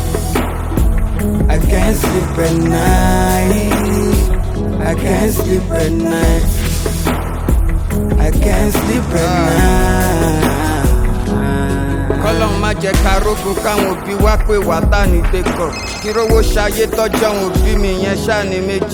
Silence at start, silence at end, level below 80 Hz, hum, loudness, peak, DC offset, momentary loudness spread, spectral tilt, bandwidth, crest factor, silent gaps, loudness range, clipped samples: 0 s; 0 s; -18 dBFS; none; -15 LUFS; 0 dBFS; under 0.1%; 5 LU; -5.5 dB/octave; 19.5 kHz; 12 dB; none; 2 LU; under 0.1%